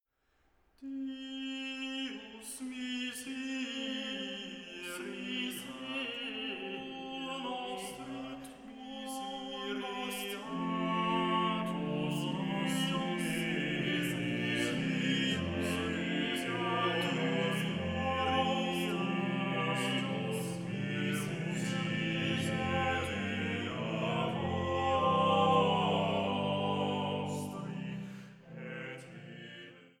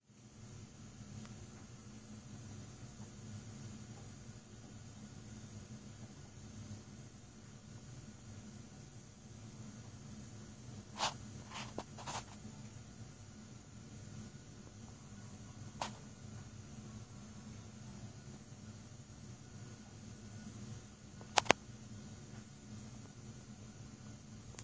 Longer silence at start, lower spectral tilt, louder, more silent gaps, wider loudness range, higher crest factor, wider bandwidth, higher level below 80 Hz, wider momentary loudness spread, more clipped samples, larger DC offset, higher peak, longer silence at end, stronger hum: first, 0.8 s vs 0 s; first, -5 dB/octave vs -3.5 dB/octave; first, -34 LUFS vs -48 LUFS; neither; second, 9 LU vs 13 LU; second, 20 dB vs 46 dB; first, 17.5 kHz vs 8 kHz; about the same, -64 dBFS vs -64 dBFS; first, 12 LU vs 9 LU; neither; neither; second, -16 dBFS vs -4 dBFS; first, 0.15 s vs 0 s; neither